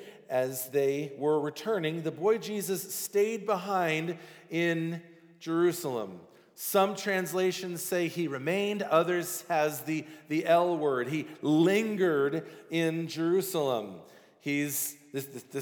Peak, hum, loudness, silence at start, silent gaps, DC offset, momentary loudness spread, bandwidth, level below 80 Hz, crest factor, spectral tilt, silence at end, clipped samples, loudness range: -12 dBFS; none; -30 LUFS; 0 s; none; under 0.1%; 11 LU; over 20 kHz; -88 dBFS; 18 dB; -4.5 dB/octave; 0 s; under 0.1%; 3 LU